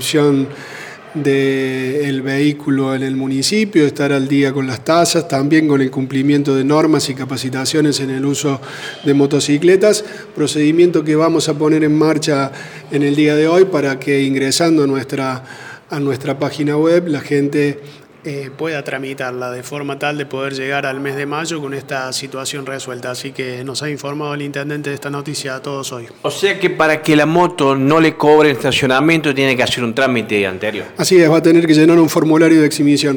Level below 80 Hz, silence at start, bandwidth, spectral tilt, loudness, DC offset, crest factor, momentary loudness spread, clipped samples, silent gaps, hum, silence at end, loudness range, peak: -58 dBFS; 0 s; 19 kHz; -5 dB/octave; -15 LUFS; under 0.1%; 12 dB; 13 LU; under 0.1%; none; none; 0 s; 9 LU; -2 dBFS